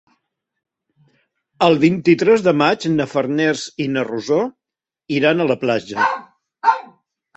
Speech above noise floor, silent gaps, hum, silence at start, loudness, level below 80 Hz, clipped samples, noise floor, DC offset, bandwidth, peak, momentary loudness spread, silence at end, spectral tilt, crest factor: 70 dB; none; none; 1.6 s; -17 LUFS; -60 dBFS; under 0.1%; -87 dBFS; under 0.1%; 8.2 kHz; -2 dBFS; 8 LU; 0.55 s; -6 dB/octave; 18 dB